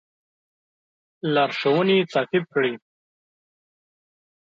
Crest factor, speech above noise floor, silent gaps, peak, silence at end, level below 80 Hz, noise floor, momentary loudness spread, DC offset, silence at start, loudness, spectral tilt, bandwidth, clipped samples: 18 dB; over 69 dB; none; -8 dBFS; 1.65 s; -76 dBFS; under -90 dBFS; 8 LU; under 0.1%; 1.25 s; -22 LUFS; -6.5 dB/octave; 7.4 kHz; under 0.1%